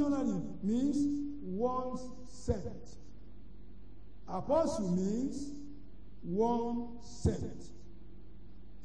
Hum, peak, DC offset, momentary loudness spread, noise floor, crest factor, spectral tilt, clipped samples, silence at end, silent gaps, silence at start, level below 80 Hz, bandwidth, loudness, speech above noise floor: none; -18 dBFS; 0.8%; 25 LU; -54 dBFS; 18 dB; -7.5 dB/octave; under 0.1%; 0 s; none; 0 s; -52 dBFS; 10 kHz; -35 LUFS; 20 dB